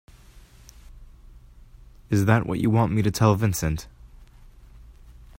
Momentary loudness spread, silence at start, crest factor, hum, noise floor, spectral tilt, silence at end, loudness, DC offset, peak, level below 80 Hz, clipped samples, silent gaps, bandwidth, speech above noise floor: 8 LU; 0.35 s; 22 dB; none; -49 dBFS; -6.5 dB/octave; 0.5 s; -23 LUFS; under 0.1%; -4 dBFS; -44 dBFS; under 0.1%; none; 16 kHz; 28 dB